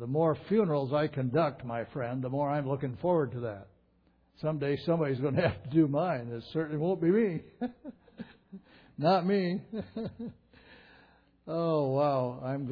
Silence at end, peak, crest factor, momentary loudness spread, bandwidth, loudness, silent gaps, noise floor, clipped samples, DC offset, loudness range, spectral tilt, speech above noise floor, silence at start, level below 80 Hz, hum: 0 s; -14 dBFS; 16 dB; 13 LU; 5.2 kHz; -31 LUFS; none; -68 dBFS; under 0.1%; under 0.1%; 4 LU; -10 dB/octave; 38 dB; 0 s; -64 dBFS; none